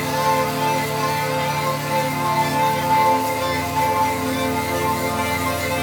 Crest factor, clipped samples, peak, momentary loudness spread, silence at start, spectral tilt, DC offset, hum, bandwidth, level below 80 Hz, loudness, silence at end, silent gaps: 16 dB; under 0.1%; -6 dBFS; 4 LU; 0 s; -4 dB/octave; under 0.1%; none; over 20 kHz; -52 dBFS; -20 LUFS; 0 s; none